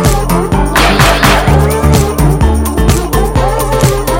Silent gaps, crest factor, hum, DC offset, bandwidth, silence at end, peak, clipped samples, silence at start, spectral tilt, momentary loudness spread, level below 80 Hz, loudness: none; 8 dB; none; under 0.1%; 17.5 kHz; 0 s; 0 dBFS; 0.3%; 0 s; -5 dB/octave; 5 LU; -14 dBFS; -10 LUFS